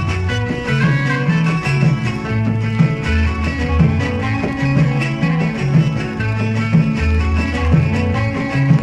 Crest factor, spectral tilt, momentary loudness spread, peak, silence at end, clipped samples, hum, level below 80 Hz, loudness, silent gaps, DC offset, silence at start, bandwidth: 14 dB; -7.5 dB/octave; 4 LU; 0 dBFS; 0 s; under 0.1%; none; -28 dBFS; -17 LUFS; none; under 0.1%; 0 s; 9.6 kHz